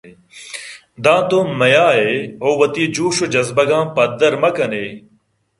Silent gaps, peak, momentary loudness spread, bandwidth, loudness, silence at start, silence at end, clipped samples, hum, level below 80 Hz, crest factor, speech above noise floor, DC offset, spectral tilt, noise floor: none; 0 dBFS; 17 LU; 11.5 kHz; -15 LUFS; 0.05 s; 0.6 s; under 0.1%; none; -58 dBFS; 16 dB; 44 dB; under 0.1%; -4.5 dB/octave; -59 dBFS